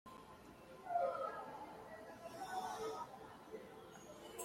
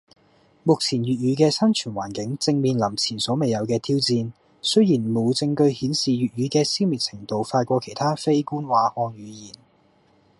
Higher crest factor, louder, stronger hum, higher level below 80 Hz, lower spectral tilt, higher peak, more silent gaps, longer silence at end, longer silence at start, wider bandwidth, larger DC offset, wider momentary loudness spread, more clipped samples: about the same, 20 dB vs 18 dB; second, -47 LUFS vs -22 LUFS; neither; second, -76 dBFS vs -62 dBFS; second, -3.5 dB/octave vs -5.5 dB/octave; second, -28 dBFS vs -4 dBFS; neither; second, 0 s vs 0.9 s; second, 0.05 s vs 0.65 s; first, 16.5 kHz vs 11.5 kHz; neither; first, 17 LU vs 9 LU; neither